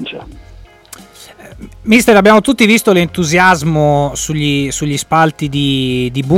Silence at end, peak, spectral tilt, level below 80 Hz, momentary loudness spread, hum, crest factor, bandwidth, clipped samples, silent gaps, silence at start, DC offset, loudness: 0 s; 0 dBFS; -5 dB/octave; -36 dBFS; 9 LU; none; 12 dB; 17 kHz; under 0.1%; none; 0 s; under 0.1%; -11 LUFS